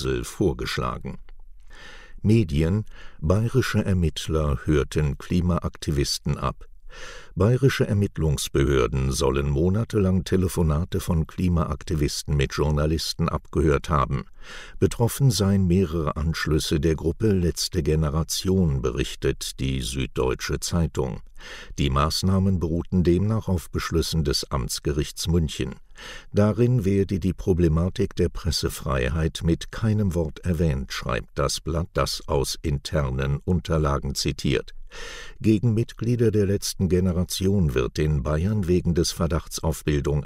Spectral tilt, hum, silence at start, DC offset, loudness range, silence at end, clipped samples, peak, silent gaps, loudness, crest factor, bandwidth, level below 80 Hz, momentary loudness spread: -6 dB/octave; none; 0 s; under 0.1%; 3 LU; 0 s; under 0.1%; -6 dBFS; none; -24 LUFS; 16 dB; 16 kHz; -34 dBFS; 7 LU